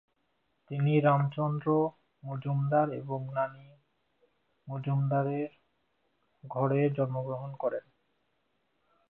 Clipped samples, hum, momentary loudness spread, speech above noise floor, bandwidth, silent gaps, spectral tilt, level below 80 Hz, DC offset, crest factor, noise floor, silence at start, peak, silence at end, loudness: under 0.1%; none; 14 LU; 48 dB; 3.8 kHz; none; -12 dB/octave; -74 dBFS; under 0.1%; 20 dB; -77 dBFS; 0.7 s; -12 dBFS; 1.3 s; -31 LUFS